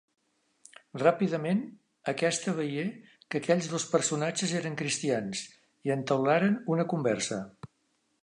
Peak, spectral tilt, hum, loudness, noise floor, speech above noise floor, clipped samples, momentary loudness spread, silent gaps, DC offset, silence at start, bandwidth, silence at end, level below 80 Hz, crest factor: -8 dBFS; -4.5 dB/octave; none; -30 LUFS; -74 dBFS; 46 dB; under 0.1%; 12 LU; none; under 0.1%; 0.95 s; 11 kHz; 0.55 s; -74 dBFS; 22 dB